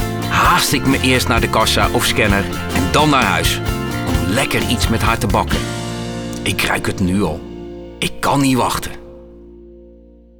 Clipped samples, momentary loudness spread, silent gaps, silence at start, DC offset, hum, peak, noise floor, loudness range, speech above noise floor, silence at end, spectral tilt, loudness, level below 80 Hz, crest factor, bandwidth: under 0.1%; 11 LU; none; 0 s; under 0.1%; none; 0 dBFS; -43 dBFS; 5 LU; 28 dB; 0.5 s; -4 dB/octave; -16 LUFS; -30 dBFS; 16 dB; over 20 kHz